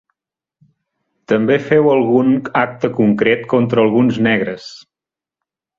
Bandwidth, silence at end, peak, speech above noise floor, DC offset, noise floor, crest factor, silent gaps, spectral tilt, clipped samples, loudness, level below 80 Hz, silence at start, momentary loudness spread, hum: 7.4 kHz; 1 s; -2 dBFS; 74 dB; under 0.1%; -88 dBFS; 14 dB; none; -7.5 dB/octave; under 0.1%; -15 LUFS; -54 dBFS; 1.3 s; 6 LU; none